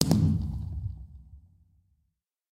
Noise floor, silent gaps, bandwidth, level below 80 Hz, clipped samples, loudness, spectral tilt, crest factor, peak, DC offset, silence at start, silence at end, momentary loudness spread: -79 dBFS; none; 16.5 kHz; -42 dBFS; under 0.1%; -29 LUFS; -6 dB/octave; 28 dB; -4 dBFS; under 0.1%; 0 s; 1.15 s; 25 LU